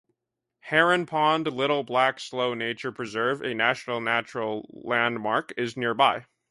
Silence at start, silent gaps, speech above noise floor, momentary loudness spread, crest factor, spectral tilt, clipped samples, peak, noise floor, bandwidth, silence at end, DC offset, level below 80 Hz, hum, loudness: 0.65 s; none; 58 dB; 9 LU; 20 dB; -4.5 dB/octave; under 0.1%; -6 dBFS; -83 dBFS; 11.5 kHz; 0.3 s; under 0.1%; -72 dBFS; none; -25 LUFS